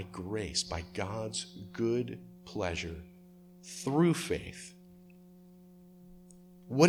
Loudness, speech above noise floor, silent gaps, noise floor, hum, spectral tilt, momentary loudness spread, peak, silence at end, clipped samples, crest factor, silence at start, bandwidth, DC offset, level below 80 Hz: -35 LUFS; 22 dB; none; -56 dBFS; none; -5 dB/octave; 27 LU; -10 dBFS; 0 s; under 0.1%; 26 dB; 0 s; 14.5 kHz; under 0.1%; -56 dBFS